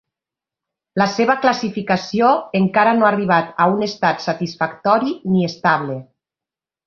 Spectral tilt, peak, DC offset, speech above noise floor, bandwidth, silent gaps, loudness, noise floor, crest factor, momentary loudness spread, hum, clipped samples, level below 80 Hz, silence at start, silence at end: -6 dB/octave; 0 dBFS; under 0.1%; 72 dB; 7 kHz; none; -17 LUFS; -89 dBFS; 18 dB; 7 LU; none; under 0.1%; -60 dBFS; 0.95 s; 0.85 s